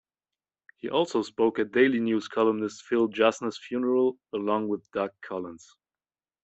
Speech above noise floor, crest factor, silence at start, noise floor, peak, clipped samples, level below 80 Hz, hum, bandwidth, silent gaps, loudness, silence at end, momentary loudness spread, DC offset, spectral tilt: over 64 dB; 20 dB; 0.85 s; under -90 dBFS; -8 dBFS; under 0.1%; -72 dBFS; none; 8.2 kHz; none; -27 LUFS; 0.85 s; 12 LU; under 0.1%; -5 dB/octave